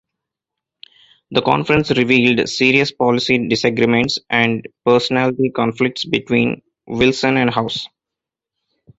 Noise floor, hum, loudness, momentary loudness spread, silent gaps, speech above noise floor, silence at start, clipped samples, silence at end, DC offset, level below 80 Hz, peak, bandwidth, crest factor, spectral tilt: -85 dBFS; none; -16 LUFS; 7 LU; none; 69 dB; 1.3 s; under 0.1%; 1.1 s; under 0.1%; -50 dBFS; 0 dBFS; 8 kHz; 16 dB; -5 dB/octave